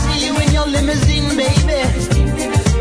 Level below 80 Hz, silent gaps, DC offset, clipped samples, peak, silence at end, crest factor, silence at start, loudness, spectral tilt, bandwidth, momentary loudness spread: -20 dBFS; none; under 0.1%; under 0.1%; 0 dBFS; 0 s; 14 dB; 0 s; -15 LUFS; -5 dB/octave; 11 kHz; 2 LU